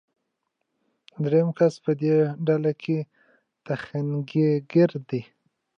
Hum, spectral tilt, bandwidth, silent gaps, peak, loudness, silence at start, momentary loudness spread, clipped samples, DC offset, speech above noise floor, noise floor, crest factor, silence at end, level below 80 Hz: none; -9 dB/octave; 7.2 kHz; none; -8 dBFS; -24 LUFS; 1.2 s; 11 LU; under 0.1%; under 0.1%; 56 dB; -79 dBFS; 16 dB; 0.55 s; -74 dBFS